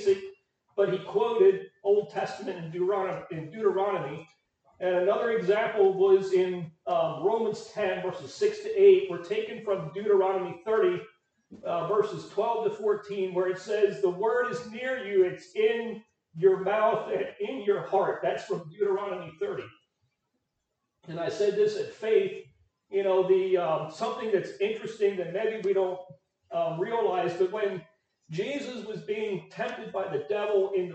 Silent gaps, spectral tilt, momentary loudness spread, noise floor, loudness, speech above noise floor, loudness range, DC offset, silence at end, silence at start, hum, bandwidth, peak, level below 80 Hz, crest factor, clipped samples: none; -6 dB/octave; 11 LU; -81 dBFS; -28 LUFS; 54 dB; 5 LU; under 0.1%; 0 s; 0 s; none; 8.2 kHz; -10 dBFS; -76 dBFS; 18 dB; under 0.1%